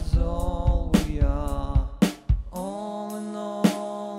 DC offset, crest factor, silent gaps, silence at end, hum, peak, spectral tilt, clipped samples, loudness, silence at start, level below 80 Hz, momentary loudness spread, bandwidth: under 0.1%; 18 dB; none; 0 s; none; -6 dBFS; -6.5 dB/octave; under 0.1%; -27 LUFS; 0 s; -28 dBFS; 9 LU; 16 kHz